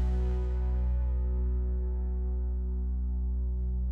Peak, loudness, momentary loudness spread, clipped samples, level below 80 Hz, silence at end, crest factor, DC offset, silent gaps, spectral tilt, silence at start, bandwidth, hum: -22 dBFS; -32 LUFS; 3 LU; under 0.1%; -30 dBFS; 0 s; 8 dB; under 0.1%; none; -10.5 dB/octave; 0 s; 2.1 kHz; none